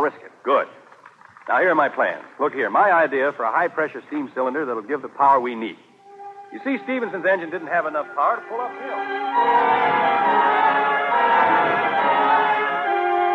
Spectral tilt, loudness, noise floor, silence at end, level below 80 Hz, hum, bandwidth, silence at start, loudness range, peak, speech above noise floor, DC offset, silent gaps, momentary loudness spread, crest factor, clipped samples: -6 dB/octave; -20 LUFS; -48 dBFS; 0 s; -80 dBFS; none; 7.4 kHz; 0 s; 6 LU; -6 dBFS; 26 dB; under 0.1%; none; 12 LU; 14 dB; under 0.1%